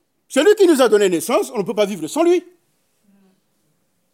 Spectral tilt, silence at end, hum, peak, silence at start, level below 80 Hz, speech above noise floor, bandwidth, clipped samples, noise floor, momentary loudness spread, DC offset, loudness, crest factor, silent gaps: -4 dB/octave; 1.75 s; none; -4 dBFS; 0.3 s; -80 dBFS; 51 dB; 16.5 kHz; under 0.1%; -67 dBFS; 8 LU; under 0.1%; -16 LUFS; 16 dB; none